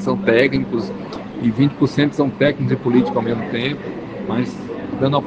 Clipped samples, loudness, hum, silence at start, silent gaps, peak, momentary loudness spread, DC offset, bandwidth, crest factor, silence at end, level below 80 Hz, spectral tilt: under 0.1%; -19 LUFS; none; 0 s; none; 0 dBFS; 12 LU; under 0.1%; 8.2 kHz; 18 dB; 0 s; -48 dBFS; -7.5 dB/octave